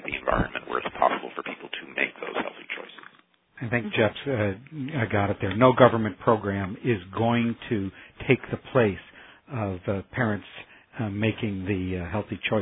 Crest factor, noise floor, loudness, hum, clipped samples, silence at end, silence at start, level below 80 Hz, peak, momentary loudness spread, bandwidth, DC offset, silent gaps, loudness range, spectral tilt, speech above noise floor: 26 dB; -60 dBFS; -26 LUFS; none; under 0.1%; 0 s; 0 s; -50 dBFS; 0 dBFS; 12 LU; 4 kHz; under 0.1%; none; 6 LU; -10.5 dB/octave; 35 dB